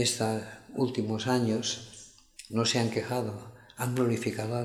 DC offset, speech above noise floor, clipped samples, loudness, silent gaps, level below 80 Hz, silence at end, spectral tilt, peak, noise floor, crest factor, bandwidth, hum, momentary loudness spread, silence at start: under 0.1%; 22 dB; under 0.1%; -30 LUFS; none; -66 dBFS; 0 s; -4.5 dB/octave; -12 dBFS; -51 dBFS; 18 dB; 16 kHz; none; 19 LU; 0 s